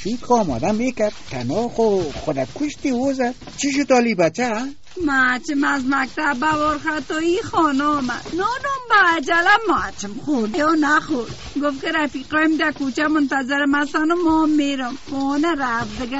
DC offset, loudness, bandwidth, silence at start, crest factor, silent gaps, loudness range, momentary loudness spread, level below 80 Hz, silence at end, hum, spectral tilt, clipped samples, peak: 1%; -19 LUFS; 8 kHz; 0 s; 16 dB; none; 3 LU; 9 LU; -46 dBFS; 0 s; none; -3 dB/octave; under 0.1%; -4 dBFS